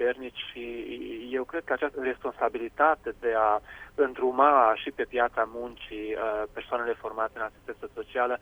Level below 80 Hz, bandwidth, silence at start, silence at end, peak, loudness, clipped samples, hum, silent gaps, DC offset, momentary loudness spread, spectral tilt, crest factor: -58 dBFS; over 20 kHz; 0 s; 0.05 s; -8 dBFS; -28 LUFS; under 0.1%; none; none; under 0.1%; 14 LU; -5.5 dB/octave; 22 dB